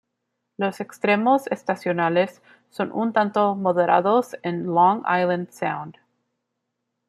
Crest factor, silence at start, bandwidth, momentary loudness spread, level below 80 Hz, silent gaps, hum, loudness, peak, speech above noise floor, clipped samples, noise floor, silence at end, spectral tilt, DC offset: 18 dB; 0.6 s; 14 kHz; 10 LU; -72 dBFS; none; none; -22 LUFS; -4 dBFS; 57 dB; under 0.1%; -79 dBFS; 1.15 s; -6.5 dB/octave; under 0.1%